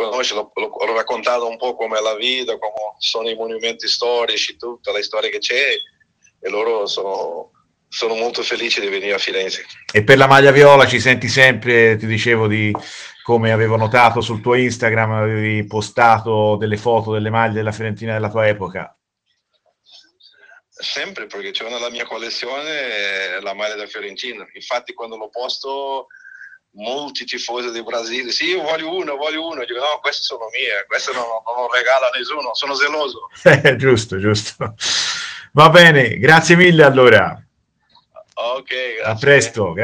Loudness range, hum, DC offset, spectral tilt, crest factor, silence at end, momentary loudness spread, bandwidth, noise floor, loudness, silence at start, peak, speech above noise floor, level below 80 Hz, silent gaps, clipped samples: 14 LU; none; under 0.1%; -4.5 dB/octave; 16 dB; 0 s; 16 LU; 15.5 kHz; -70 dBFS; -16 LUFS; 0 s; 0 dBFS; 54 dB; -54 dBFS; none; 0.1%